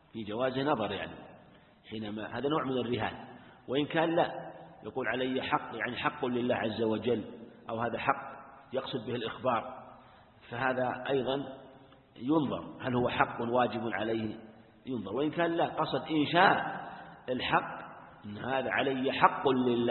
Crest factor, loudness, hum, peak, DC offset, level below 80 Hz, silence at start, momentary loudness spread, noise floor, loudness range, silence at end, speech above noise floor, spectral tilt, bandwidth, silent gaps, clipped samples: 26 dB; -32 LUFS; none; -6 dBFS; under 0.1%; -64 dBFS; 0.15 s; 17 LU; -58 dBFS; 5 LU; 0 s; 27 dB; -9.5 dB/octave; 4.3 kHz; none; under 0.1%